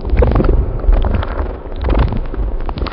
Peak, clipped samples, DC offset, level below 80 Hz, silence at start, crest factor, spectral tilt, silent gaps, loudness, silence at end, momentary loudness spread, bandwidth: 0 dBFS; under 0.1%; under 0.1%; -14 dBFS; 0 s; 14 dB; -12 dB/octave; none; -18 LUFS; 0 s; 9 LU; 5.4 kHz